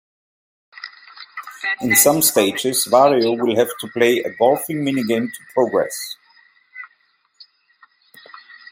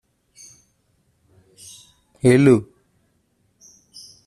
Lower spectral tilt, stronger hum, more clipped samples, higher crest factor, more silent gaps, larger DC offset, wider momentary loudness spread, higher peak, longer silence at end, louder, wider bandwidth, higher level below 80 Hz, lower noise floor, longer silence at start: second, -3 dB/octave vs -7 dB/octave; neither; neither; about the same, 20 dB vs 20 dB; neither; neither; second, 23 LU vs 28 LU; about the same, 0 dBFS vs -2 dBFS; first, 1.85 s vs 1.65 s; about the same, -17 LUFS vs -16 LUFS; first, 16.5 kHz vs 13 kHz; second, -66 dBFS vs -56 dBFS; second, -61 dBFS vs -66 dBFS; second, 0.8 s vs 2.25 s